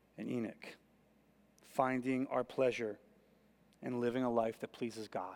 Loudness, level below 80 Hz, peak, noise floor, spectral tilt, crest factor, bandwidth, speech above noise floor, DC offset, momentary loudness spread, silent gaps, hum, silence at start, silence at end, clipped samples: -38 LUFS; -78 dBFS; -18 dBFS; -70 dBFS; -6.5 dB/octave; 22 dB; 17 kHz; 32 dB; under 0.1%; 12 LU; none; none; 0.15 s; 0 s; under 0.1%